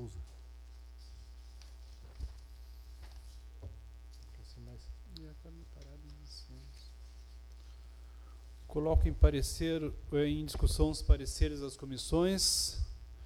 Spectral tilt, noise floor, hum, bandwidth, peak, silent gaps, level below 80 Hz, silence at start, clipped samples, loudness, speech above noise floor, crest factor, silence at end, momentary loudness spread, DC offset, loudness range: -5 dB/octave; -52 dBFS; none; 15.5 kHz; -12 dBFS; none; -38 dBFS; 0 s; under 0.1%; -33 LUFS; 20 dB; 24 dB; 0 s; 24 LU; under 0.1%; 20 LU